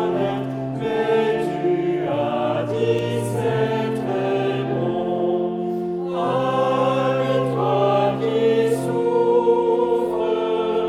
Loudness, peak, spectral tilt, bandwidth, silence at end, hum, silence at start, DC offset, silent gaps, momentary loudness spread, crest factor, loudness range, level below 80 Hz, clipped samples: -21 LUFS; -6 dBFS; -7 dB/octave; 13.5 kHz; 0 s; none; 0 s; under 0.1%; none; 5 LU; 14 dB; 3 LU; -58 dBFS; under 0.1%